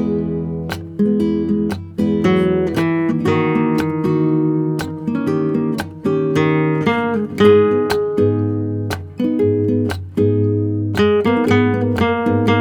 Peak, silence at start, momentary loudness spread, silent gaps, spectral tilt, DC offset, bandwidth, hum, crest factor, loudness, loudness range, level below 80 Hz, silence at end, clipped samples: 0 dBFS; 0 s; 7 LU; none; -8 dB/octave; under 0.1%; 17.5 kHz; none; 16 dB; -17 LUFS; 2 LU; -46 dBFS; 0 s; under 0.1%